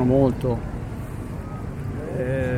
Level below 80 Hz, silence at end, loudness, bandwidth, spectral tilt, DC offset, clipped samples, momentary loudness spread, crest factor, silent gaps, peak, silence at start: -36 dBFS; 0 s; -26 LUFS; 15.5 kHz; -9 dB/octave; under 0.1%; under 0.1%; 13 LU; 16 dB; none; -8 dBFS; 0 s